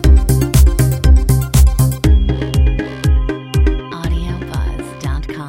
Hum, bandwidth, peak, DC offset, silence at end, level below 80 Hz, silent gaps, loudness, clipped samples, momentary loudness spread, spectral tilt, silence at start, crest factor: none; 17 kHz; 0 dBFS; under 0.1%; 0 s; -14 dBFS; none; -15 LUFS; under 0.1%; 11 LU; -6 dB/octave; 0 s; 12 dB